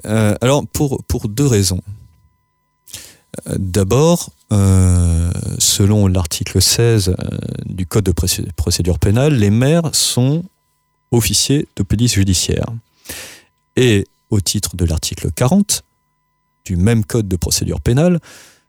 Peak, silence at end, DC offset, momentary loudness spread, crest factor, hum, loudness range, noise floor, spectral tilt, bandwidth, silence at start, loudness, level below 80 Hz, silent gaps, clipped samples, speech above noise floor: -2 dBFS; 0.3 s; under 0.1%; 12 LU; 14 dB; none; 4 LU; -65 dBFS; -5 dB/octave; 18 kHz; 0.05 s; -15 LUFS; -32 dBFS; none; under 0.1%; 50 dB